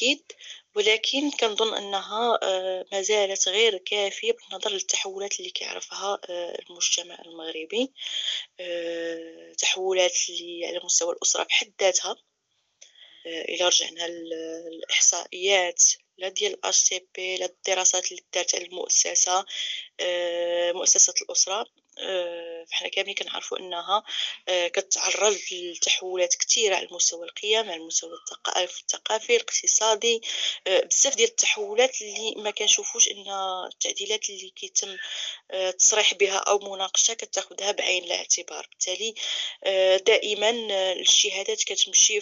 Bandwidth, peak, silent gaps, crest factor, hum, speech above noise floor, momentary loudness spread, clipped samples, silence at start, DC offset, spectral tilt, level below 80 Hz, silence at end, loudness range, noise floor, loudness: 8.2 kHz; -6 dBFS; none; 20 dB; none; 48 dB; 13 LU; under 0.1%; 0 s; under 0.1%; 1.5 dB/octave; under -90 dBFS; 0 s; 6 LU; -74 dBFS; -23 LUFS